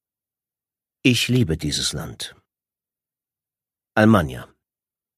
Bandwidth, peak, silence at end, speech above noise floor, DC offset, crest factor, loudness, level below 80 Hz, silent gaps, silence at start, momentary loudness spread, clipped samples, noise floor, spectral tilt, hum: 15.5 kHz; 0 dBFS; 0.75 s; over 71 dB; under 0.1%; 22 dB; -20 LUFS; -46 dBFS; none; 1.05 s; 17 LU; under 0.1%; under -90 dBFS; -5 dB/octave; none